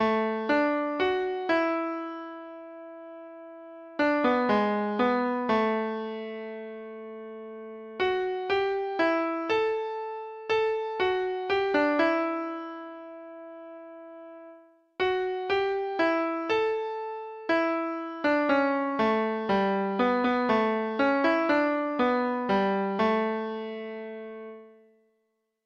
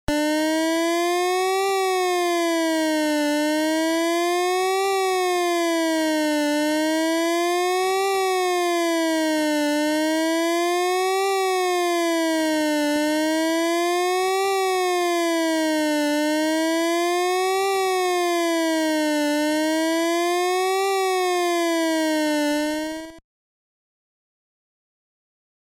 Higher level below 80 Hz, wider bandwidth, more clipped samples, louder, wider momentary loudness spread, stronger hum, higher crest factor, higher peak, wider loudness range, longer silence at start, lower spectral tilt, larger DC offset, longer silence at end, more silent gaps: second, -66 dBFS vs -54 dBFS; second, 7.4 kHz vs 17 kHz; neither; second, -27 LUFS vs -21 LUFS; first, 19 LU vs 0 LU; neither; about the same, 16 dB vs 12 dB; about the same, -12 dBFS vs -10 dBFS; first, 6 LU vs 1 LU; about the same, 0 s vs 0.1 s; first, -6.5 dB/octave vs -2 dB/octave; neither; second, 0.95 s vs 2.5 s; neither